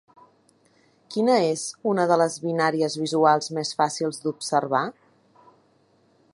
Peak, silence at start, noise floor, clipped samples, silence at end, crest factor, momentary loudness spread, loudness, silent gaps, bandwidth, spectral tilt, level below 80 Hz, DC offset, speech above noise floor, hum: -6 dBFS; 1.1 s; -62 dBFS; under 0.1%; 1.4 s; 20 dB; 8 LU; -23 LUFS; none; 11.5 kHz; -4.5 dB/octave; -76 dBFS; under 0.1%; 39 dB; none